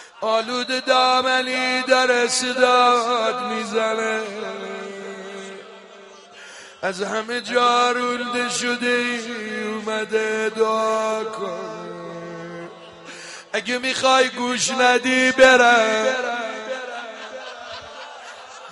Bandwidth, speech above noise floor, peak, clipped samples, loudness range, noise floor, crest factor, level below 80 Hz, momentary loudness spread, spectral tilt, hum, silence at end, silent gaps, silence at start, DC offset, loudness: 11.5 kHz; 24 dB; 0 dBFS; under 0.1%; 10 LU; -44 dBFS; 20 dB; -64 dBFS; 19 LU; -2 dB/octave; none; 0 s; none; 0 s; under 0.1%; -19 LUFS